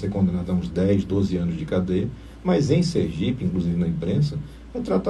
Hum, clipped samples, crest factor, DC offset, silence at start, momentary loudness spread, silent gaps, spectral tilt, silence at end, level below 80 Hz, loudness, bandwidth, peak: none; under 0.1%; 16 dB; under 0.1%; 0 s; 7 LU; none; -8 dB/octave; 0 s; -42 dBFS; -23 LUFS; 10 kHz; -6 dBFS